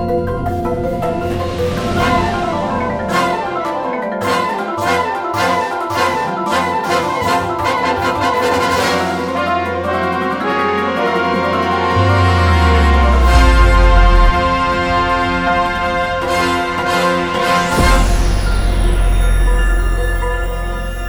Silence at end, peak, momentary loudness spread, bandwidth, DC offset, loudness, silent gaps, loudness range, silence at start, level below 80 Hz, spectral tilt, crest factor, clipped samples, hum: 0 s; 0 dBFS; 7 LU; over 20 kHz; under 0.1%; -15 LUFS; none; 5 LU; 0 s; -18 dBFS; -5.5 dB/octave; 14 dB; under 0.1%; none